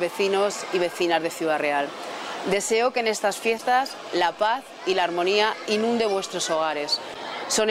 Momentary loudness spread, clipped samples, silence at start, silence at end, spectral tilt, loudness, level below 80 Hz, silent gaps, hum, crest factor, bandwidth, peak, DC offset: 6 LU; under 0.1%; 0 s; 0 s; -2.5 dB/octave; -24 LUFS; -68 dBFS; none; none; 18 dB; 16 kHz; -6 dBFS; under 0.1%